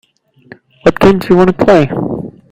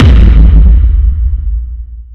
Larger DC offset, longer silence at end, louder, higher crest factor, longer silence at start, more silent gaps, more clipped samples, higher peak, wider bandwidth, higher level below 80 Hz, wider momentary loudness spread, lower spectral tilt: neither; first, 0.2 s vs 0 s; about the same, -10 LUFS vs -8 LUFS; first, 12 dB vs 6 dB; first, 0.85 s vs 0 s; neither; second, 1% vs 10%; about the same, 0 dBFS vs 0 dBFS; first, 16 kHz vs 4.2 kHz; second, -36 dBFS vs -6 dBFS; second, 11 LU vs 15 LU; second, -7.5 dB/octave vs -9 dB/octave